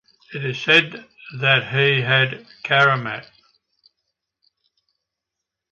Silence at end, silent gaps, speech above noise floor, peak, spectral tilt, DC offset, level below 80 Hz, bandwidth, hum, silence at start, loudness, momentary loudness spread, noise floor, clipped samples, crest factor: 2.5 s; none; 64 dB; -2 dBFS; -5.5 dB/octave; under 0.1%; -64 dBFS; 8 kHz; none; 0.3 s; -18 LUFS; 18 LU; -83 dBFS; under 0.1%; 20 dB